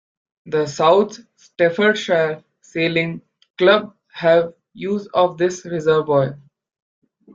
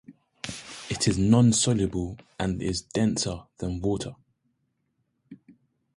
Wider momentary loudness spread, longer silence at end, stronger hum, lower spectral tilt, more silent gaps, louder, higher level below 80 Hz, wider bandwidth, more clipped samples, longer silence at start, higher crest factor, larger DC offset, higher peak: second, 12 LU vs 17 LU; first, 1 s vs 0.6 s; neither; about the same, -5.5 dB/octave vs -5 dB/octave; first, 3.50-3.54 s vs none; first, -18 LUFS vs -26 LUFS; second, -62 dBFS vs -46 dBFS; second, 7.6 kHz vs 11.5 kHz; neither; first, 0.45 s vs 0.1 s; about the same, 18 dB vs 20 dB; neither; first, 0 dBFS vs -8 dBFS